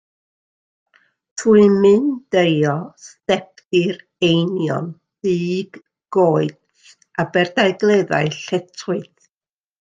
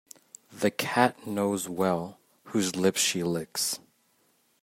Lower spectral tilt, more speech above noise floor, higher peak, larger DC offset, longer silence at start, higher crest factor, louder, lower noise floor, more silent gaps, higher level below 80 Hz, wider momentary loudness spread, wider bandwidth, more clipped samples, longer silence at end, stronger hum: first, -6 dB/octave vs -3.5 dB/octave; first, over 73 dB vs 41 dB; first, -2 dBFS vs -6 dBFS; neither; first, 1.35 s vs 0.5 s; second, 16 dB vs 24 dB; first, -18 LUFS vs -28 LUFS; first, under -90 dBFS vs -68 dBFS; first, 3.65-3.69 s vs none; first, -60 dBFS vs -72 dBFS; about the same, 13 LU vs 14 LU; second, 9.2 kHz vs 16 kHz; neither; about the same, 0.75 s vs 0.85 s; neither